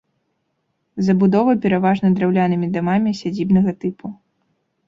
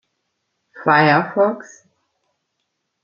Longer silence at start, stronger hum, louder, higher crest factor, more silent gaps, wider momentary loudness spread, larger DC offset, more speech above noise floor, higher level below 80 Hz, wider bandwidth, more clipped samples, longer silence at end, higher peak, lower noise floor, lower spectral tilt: first, 0.95 s vs 0.75 s; neither; about the same, -18 LUFS vs -16 LUFS; about the same, 16 dB vs 18 dB; neither; about the same, 12 LU vs 11 LU; neither; second, 54 dB vs 58 dB; first, -54 dBFS vs -66 dBFS; about the same, 7.4 kHz vs 7.2 kHz; neither; second, 0.75 s vs 1.4 s; about the same, -4 dBFS vs -2 dBFS; about the same, -71 dBFS vs -74 dBFS; first, -8.5 dB/octave vs -6.5 dB/octave